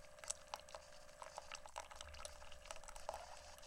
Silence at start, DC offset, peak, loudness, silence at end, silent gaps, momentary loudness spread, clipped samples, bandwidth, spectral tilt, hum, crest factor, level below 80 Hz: 0 s; under 0.1%; -22 dBFS; -53 LUFS; 0 s; none; 9 LU; under 0.1%; 16.5 kHz; -1 dB/octave; none; 30 dB; -64 dBFS